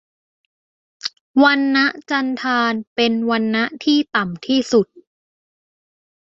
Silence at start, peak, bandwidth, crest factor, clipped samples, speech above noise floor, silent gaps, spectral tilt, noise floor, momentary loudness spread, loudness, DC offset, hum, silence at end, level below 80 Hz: 1.05 s; -2 dBFS; 7.6 kHz; 18 dB; under 0.1%; over 73 dB; 1.21-1.34 s, 2.87-2.96 s; -4.5 dB/octave; under -90 dBFS; 7 LU; -18 LUFS; under 0.1%; none; 1.3 s; -64 dBFS